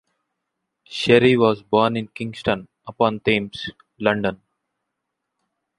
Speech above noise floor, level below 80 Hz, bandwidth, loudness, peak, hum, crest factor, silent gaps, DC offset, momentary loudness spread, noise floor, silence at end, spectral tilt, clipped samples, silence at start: 60 dB; -54 dBFS; 11.5 kHz; -20 LUFS; -2 dBFS; none; 20 dB; none; under 0.1%; 16 LU; -80 dBFS; 1.45 s; -6 dB/octave; under 0.1%; 0.9 s